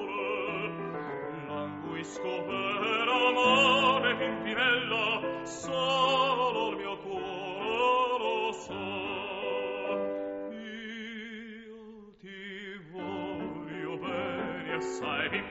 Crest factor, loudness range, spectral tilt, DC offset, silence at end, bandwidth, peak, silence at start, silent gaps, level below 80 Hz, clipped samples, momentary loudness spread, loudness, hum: 20 dB; 13 LU; -1 dB/octave; under 0.1%; 0 s; 8 kHz; -12 dBFS; 0 s; none; -66 dBFS; under 0.1%; 16 LU; -30 LUFS; none